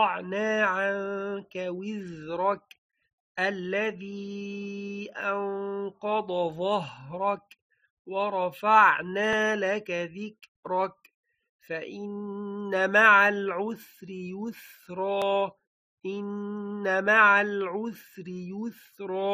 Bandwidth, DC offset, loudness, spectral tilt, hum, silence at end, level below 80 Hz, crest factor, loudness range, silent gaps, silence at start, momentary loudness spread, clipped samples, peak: 15 kHz; under 0.1%; -27 LUFS; -5 dB/octave; none; 0 s; -74 dBFS; 22 dB; 7 LU; 2.78-2.90 s, 3.13-3.35 s, 7.62-7.70 s, 7.90-8.05 s, 10.48-10.63 s, 11.14-11.24 s, 11.49-11.59 s, 15.67-15.97 s; 0 s; 19 LU; under 0.1%; -6 dBFS